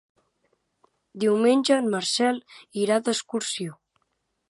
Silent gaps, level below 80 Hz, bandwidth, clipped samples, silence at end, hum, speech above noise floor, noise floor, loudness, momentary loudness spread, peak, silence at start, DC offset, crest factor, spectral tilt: none; -78 dBFS; 11.5 kHz; under 0.1%; 0.75 s; none; 52 dB; -75 dBFS; -24 LUFS; 12 LU; -8 dBFS; 1.15 s; under 0.1%; 18 dB; -3.5 dB/octave